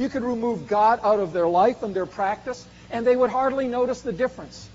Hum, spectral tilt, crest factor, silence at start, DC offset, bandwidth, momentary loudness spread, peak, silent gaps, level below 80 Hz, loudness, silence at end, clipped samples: none; -4.5 dB/octave; 16 dB; 0 s; under 0.1%; 7.6 kHz; 11 LU; -8 dBFS; none; -54 dBFS; -23 LUFS; 0 s; under 0.1%